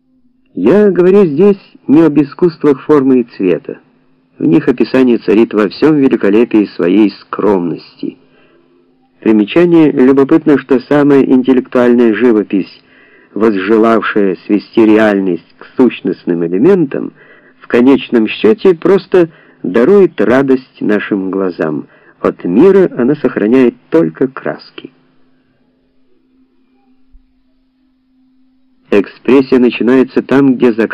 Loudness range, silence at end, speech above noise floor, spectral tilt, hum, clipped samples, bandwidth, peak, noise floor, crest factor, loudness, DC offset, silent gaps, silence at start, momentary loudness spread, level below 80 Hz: 5 LU; 0 s; 45 dB; -8.5 dB/octave; none; 0.3%; 7 kHz; 0 dBFS; -55 dBFS; 10 dB; -10 LUFS; under 0.1%; none; 0.55 s; 10 LU; -50 dBFS